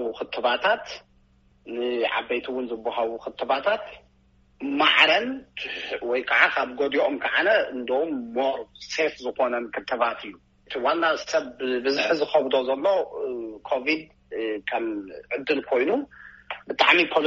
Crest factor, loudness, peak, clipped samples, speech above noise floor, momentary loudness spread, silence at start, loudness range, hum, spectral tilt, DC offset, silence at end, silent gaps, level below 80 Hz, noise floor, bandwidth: 22 dB; -24 LUFS; -2 dBFS; under 0.1%; 36 dB; 14 LU; 0 s; 6 LU; none; 0.5 dB/octave; under 0.1%; 0 s; none; -62 dBFS; -60 dBFS; 7.6 kHz